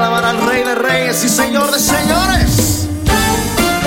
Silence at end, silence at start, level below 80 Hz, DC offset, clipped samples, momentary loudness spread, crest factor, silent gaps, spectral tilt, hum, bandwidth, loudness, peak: 0 s; 0 s; -26 dBFS; under 0.1%; under 0.1%; 2 LU; 12 dB; none; -3.5 dB/octave; none; 17 kHz; -13 LUFS; 0 dBFS